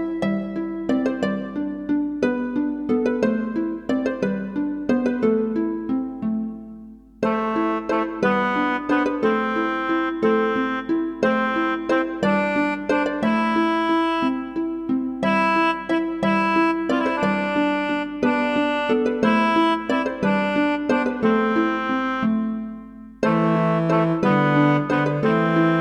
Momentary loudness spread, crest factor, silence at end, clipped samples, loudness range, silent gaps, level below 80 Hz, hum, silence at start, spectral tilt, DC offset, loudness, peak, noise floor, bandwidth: 7 LU; 16 dB; 0 s; under 0.1%; 3 LU; none; -52 dBFS; none; 0 s; -7 dB/octave; under 0.1%; -21 LUFS; -6 dBFS; -41 dBFS; 9.4 kHz